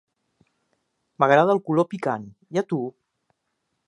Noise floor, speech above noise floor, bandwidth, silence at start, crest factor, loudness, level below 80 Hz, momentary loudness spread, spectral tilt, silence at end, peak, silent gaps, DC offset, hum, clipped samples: -77 dBFS; 55 dB; 11 kHz; 1.2 s; 22 dB; -22 LUFS; -74 dBFS; 12 LU; -7 dB/octave; 1 s; -2 dBFS; none; under 0.1%; none; under 0.1%